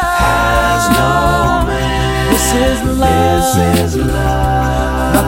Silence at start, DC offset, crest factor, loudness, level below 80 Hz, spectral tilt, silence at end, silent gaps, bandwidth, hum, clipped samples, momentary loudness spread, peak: 0 s; under 0.1%; 12 dB; -13 LUFS; -20 dBFS; -5 dB/octave; 0 s; none; 16.5 kHz; none; under 0.1%; 3 LU; 0 dBFS